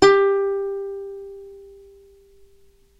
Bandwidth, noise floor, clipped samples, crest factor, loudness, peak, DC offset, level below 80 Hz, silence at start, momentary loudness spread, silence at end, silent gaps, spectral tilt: 9.6 kHz; -55 dBFS; under 0.1%; 22 dB; -21 LUFS; 0 dBFS; under 0.1%; -54 dBFS; 0 s; 25 LU; 1.35 s; none; -4 dB/octave